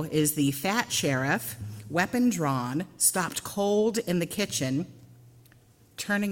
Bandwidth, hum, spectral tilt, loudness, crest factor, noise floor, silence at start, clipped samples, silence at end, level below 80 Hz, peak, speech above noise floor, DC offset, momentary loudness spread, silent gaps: 17 kHz; none; -4 dB/octave; -27 LUFS; 20 dB; -58 dBFS; 0 s; under 0.1%; 0 s; -62 dBFS; -8 dBFS; 31 dB; under 0.1%; 9 LU; none